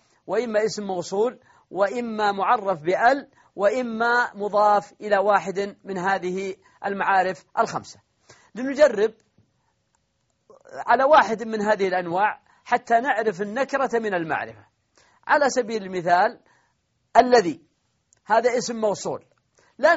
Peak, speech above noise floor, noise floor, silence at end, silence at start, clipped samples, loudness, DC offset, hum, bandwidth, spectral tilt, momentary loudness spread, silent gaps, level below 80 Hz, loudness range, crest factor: -4 dBFS; 49 dB; -71 dBFS; 0 s; 0.3 s; under 0.1%; -22 LUFS; under 0.1%; none; 8 kHz; -3 dB/octave; 12 LU; none; -64 dBFS; 3 LU; 20 dB